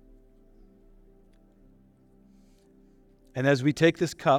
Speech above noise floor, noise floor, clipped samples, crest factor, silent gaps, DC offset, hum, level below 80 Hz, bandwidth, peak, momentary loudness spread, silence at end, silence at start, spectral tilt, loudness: 35 dB; -59 dBFS; under 0.1%; 22 dB; none; under 0.1%; none; -60 dBFS; 15.5 kHz; -8 dBFS; 7 LU; 0 s; 3.35 s; -6 dB/octave; -25 LUFS